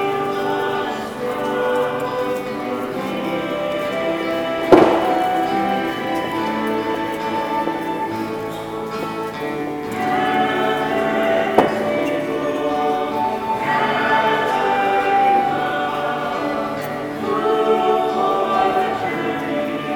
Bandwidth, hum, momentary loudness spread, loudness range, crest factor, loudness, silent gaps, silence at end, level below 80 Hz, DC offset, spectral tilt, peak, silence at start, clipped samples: 19 kHz; none; 8 LU; 4 LU; 20 dB; -20 LUFS; none; 0 s; -54 dBFS; under 0.1%; -5.5 dB/octave; 0 dBFS; 0 s; under 0.1%